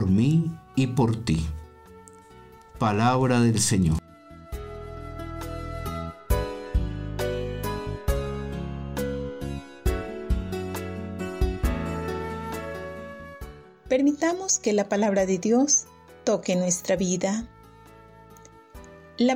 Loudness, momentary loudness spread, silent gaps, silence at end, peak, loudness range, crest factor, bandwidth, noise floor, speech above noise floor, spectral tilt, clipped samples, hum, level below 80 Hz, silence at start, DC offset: -26 LUFS; 17 LU; none; 0 s; -10 dBFS; 8 LU; 16 dB; 16 kHz; -50 dBFS; 27 dB; -5 dB/octave; under 0.1%; none; -36 dBFS; 0 s; under 0.1%